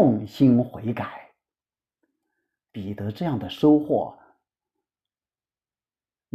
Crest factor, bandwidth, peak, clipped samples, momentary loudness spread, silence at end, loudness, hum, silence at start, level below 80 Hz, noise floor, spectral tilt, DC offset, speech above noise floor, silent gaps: 20 dB; 13.5 kHz; -6 dBFS; under 0.1%; 16 LU; 2.2 s; -23 LUFS; none; 0 s; -62 dBFS; under -90 dBFS; -9 dB/octave; under 0.1%; over 68 dB; none